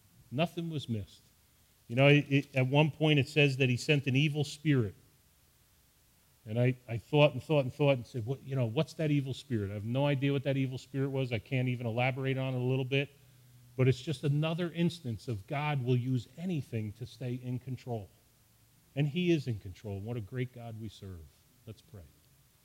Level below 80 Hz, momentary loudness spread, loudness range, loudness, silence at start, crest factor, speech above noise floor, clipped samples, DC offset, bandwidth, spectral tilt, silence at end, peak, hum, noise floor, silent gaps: -66 dBFS; 14 LU; 8 LU; -32 LUFS; 0.3 s; 22 dB; 35 dB; under 0.1%; under 0.1%; 15.5 kHz; -7 dB/octave; 0.6 s; -10 dBFS; none; -66 dBFS; none